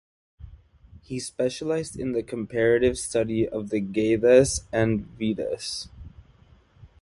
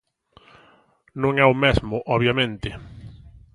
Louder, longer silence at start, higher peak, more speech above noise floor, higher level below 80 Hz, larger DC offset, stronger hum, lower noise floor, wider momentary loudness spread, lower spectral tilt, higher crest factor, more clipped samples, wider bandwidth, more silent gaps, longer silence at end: second, -25 LUFS vs -20 LUFS; second, 0.4 s vs 1.15 s; second, -6 dBFS vs -2 dBFS; second, 32 dB vs 37 dB; second, -48 dBFS vs -40 dBFS; neither; neither; about the same, -56 dBFS vs -58 dBFS; second, 14 LU vs 23 LU; second, -5 dB/octave vs -7 dB/octave; about the same, 20 dB vs 22 dB; neither; about the same, 11.5 kHz vs 11 kHz; neither; second, 0.15 s vs 0.4 s